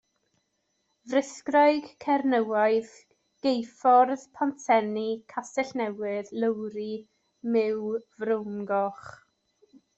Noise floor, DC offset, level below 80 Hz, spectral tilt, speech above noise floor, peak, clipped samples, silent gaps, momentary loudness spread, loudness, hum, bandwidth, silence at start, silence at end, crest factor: -76 dBFS; under 0.1%; -76 dBFS; -5 dB/octave; 50 dB; -10 dBFS; under 0.1%; none; 12 LU; -27 LUFS; none; 8.2 kHz; 1.05 s; 0.85 s; 18 dB